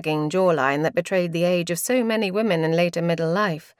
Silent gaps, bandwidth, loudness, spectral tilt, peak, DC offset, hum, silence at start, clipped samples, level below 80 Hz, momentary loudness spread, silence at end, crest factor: none; 16.5 kHz; -22 LUFS; -5.5 dB/octave; -6 dBFS; under 0.1%; none; 0 s; under 0.1%; -68 dBFS; 3 LU; 0.2 s; 16 dB